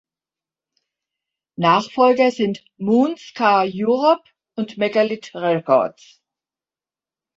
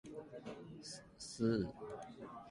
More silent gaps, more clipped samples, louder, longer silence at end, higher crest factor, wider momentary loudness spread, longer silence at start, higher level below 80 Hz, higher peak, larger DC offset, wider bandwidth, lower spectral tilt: neither; neither; first, -19 LUFS vs -44 LUFS; first, 1.45 s vs 0 s; about the same, 18 dB vs 20 dB; second, 11 LU vs 15 LU; first, 1.6 s vs 0.05 s; about the same, -68 dBFS vs -66 dBFS; first, -2 dBFS vs -24 dBFS; neither; second, 7.8 kHz vs 11.5 kHz; about the same, -6 dB/octave vs -5.5 dB/octave